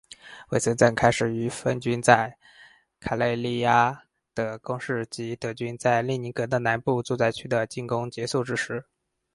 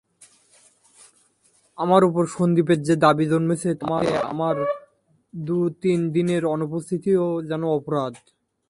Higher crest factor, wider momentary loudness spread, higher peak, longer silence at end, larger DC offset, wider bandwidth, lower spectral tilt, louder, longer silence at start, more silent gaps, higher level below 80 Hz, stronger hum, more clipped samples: about the same, 24 dB vs 20 dB; first, 12 LU vs 9 LU; about the same, 0 dBFS vs -2 dBFS; about the same, 0.55 s vs 0.55 s; neither; about the same, 11.5 kHz vs 11.5 kHz; second, -5 dB/octave vs -7 dB/octave; second, -25 LUFS vs -22 LUFS; second, 0.25 s vs 1.8 s; neither; first, -56 dBFS vs -62 dBFS; neither; neither